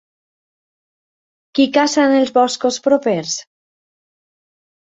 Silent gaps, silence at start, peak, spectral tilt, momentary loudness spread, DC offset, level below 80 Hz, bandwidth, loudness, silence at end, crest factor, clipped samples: none; 1.55 s; -2 dBFS; -3.5 dB/octave; 10 LU; under 0.1%; -66 dBFS; 8 kHz; -16 LUFS; 1.55 s; 18 dB; under 0.1%